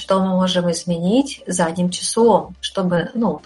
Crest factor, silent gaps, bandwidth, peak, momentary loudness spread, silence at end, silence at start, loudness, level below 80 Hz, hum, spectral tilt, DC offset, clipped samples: 16 dB; none; 11.5 kHz; -2 dBFS; 6 LU; 0.05 s; 0 s; -18 LUFS; -52 dBFS; none; -5 dB/octave; under 0.1%; under 0.1%